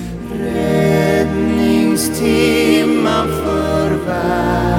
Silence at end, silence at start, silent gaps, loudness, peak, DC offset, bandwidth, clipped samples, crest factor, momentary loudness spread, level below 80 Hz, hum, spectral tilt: 0 s; 0 s; none; -15 LUFS; -2 dBFS; under 0.1%; 17.5 kHz; under 0.1%; 14 dB; 5 LU; -32 dBFS; none; -5.5 dB/octave